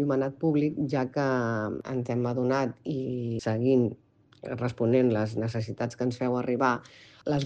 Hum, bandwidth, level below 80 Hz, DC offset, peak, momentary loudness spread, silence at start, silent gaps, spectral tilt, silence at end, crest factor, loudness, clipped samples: none; 8.6 kHz; -64 dBFS; under 0.1%; -10 dBFS; 9 LU; 0 s; none; -7.5 dB/octave; 0 s; 18 dB; -28 LUFS; under 0.1%